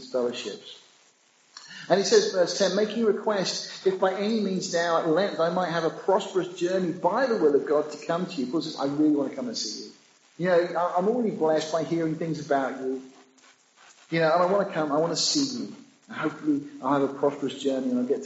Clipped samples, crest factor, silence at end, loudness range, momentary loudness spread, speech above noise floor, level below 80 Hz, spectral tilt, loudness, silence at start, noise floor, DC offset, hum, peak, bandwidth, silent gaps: under 0.1%; 18 dB; 0 s; 3 LU; 9 LU; 36 dB; -78 dBFS; -4 dB/octave; -26 LUFS; 0 s; -62 dBFS; under 0.1%; none; -8 dBFS; 8 kHz; none